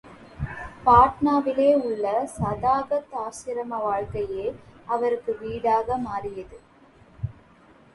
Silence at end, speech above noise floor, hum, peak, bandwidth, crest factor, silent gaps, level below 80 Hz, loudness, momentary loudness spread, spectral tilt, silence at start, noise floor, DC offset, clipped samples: 0.65 s; 30 dB; none; -4 dBFS; 11.5 kHz; 20 dB; none; -46 dBFS; -24 LUFS; 18 LU; -7 dB/octave; 0.05 s; -54 dBFS; under 0.1%; under 0.1%